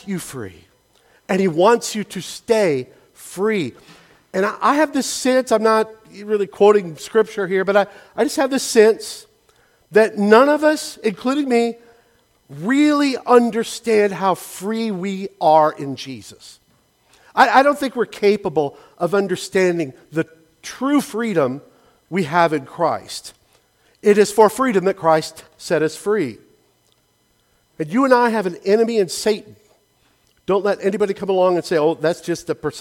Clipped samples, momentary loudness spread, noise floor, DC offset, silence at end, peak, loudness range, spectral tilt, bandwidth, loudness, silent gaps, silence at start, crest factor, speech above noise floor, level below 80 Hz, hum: under 0.1%; 14 LU; -62 dBFS; under 0.1%; 0 s; 0 dBFS; 4 LU; -4.5 dB/octave; 16.5 kHz; -18 LUFS; none; 0.05 s; 18 dB; 44 dB; -62 dBFS; none